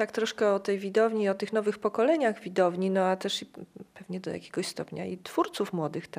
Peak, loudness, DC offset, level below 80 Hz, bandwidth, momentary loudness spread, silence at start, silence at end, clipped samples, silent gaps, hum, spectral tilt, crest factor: -12 dBFS; -29 LUFS; under 0.1%; -76 dBFS; 15.5 kHz; 12 LU; 0 s; 0 s; under 0.1%; none; none; -5 dB/octave; 18 dB